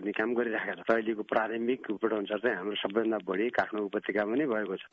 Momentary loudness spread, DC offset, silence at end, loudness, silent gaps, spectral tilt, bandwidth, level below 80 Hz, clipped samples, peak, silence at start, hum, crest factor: 3 LU; under 0.1%; 0.05 s; -31 LUFS; none; -7 dB/octave; 7 kHz; -74 dBFS; under 0.1%; -14 dBFS; 0 s; none; 16 dB